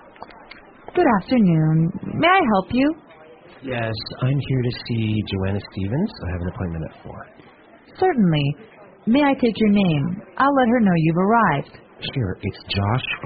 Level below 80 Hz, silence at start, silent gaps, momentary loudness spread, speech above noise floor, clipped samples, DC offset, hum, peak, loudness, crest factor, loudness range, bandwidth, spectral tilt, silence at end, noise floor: -46 dBFS; 0.2 s; none; 13 LU; 25 dB; under 0.1%; under 0.1%; none; -4 dBFS; -20 LUFS; 16 dB; 6 LU; 5 kHz; -5.5 dB/octave; 0 s; -45 dBFS